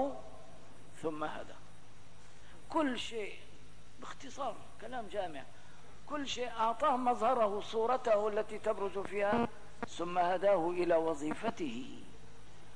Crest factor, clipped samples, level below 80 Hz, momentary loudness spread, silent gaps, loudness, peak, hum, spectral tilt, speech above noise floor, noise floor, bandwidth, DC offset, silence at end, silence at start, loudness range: 16 dB; under 0.1%; -64 dBFS; 19 LU; none; -35 LUFS; -20 dBFS; none; -5 dB/octave; 24 dB; -59 dBFS; 10.5 kHz; 0.8%; 0 s; 0 s; 9 LU